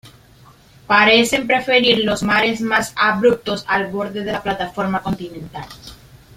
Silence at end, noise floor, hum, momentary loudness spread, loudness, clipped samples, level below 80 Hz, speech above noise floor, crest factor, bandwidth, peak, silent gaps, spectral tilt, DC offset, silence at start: 0.45 s; -47 dBFS; none; 18 LU; -16 LUFS; under 0.1%; -48 dBFS; 30 dB; 18 dB; 16 kHz; 0 dBFS; none; -4 dB/octave; under 0.1%; 0.05 s